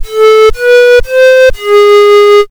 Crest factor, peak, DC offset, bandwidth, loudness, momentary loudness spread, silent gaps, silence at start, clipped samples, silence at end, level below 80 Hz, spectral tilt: 4 dB; 0 dBFS; 2%; 20 kHz; -4 LUFS; 3 LU; none; 0 s; under 0.1%; 0.05 s; -24 dBFS; -3 dB/octave